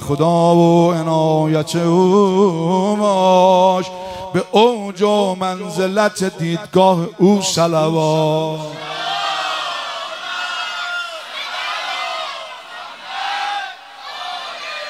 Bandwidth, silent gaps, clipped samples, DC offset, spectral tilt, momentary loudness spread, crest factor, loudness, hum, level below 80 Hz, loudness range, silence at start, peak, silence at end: 15 kHz; none; under 0.1%; under 0.1%; -5.5 dB/octave; 14 LU; 16 dB; -16 LUFS; none; -58 dBFS; 9 LU; 0 s; 0 dBFS; 0 s